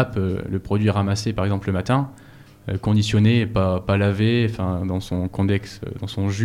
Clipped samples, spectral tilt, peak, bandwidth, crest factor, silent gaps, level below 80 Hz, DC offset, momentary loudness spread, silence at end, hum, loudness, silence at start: under 0.1%; -7 dB/octave; -6 dBFS; 11.5 kHz; 14 dB; none; -44 dBFS; under 0.1%; 10 LU; 0 s; none; -22 LUFS; 0 s